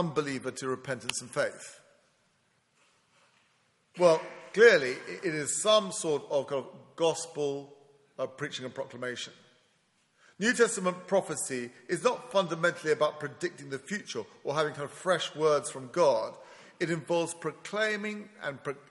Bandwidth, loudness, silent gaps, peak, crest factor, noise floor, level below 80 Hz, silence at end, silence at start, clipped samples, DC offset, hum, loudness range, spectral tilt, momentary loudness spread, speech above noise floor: 11.5 kHz; -30 LUFS; none; -8 dBFS; 22 dB; -71 dBFS; -78 dBFS; 0.1 s; 0 s; under 0.1%; under 0.1%; none; 9 LU; -3.5 dB/octave; 14 LU; 41 dB